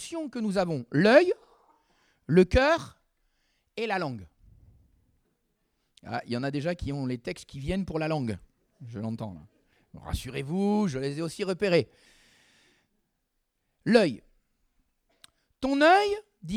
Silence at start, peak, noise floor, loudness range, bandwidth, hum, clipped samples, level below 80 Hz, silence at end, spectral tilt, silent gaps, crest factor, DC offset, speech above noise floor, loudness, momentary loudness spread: 0 s; -4 dBFS; -78 dBFS; 10 LU; 15 kHz; none; under 0.1%; -48 dBFS; 0 s; -6 dB/octave; none; 24 dB; under 0.1%; 52 dB; -27 LUFS; 18 LU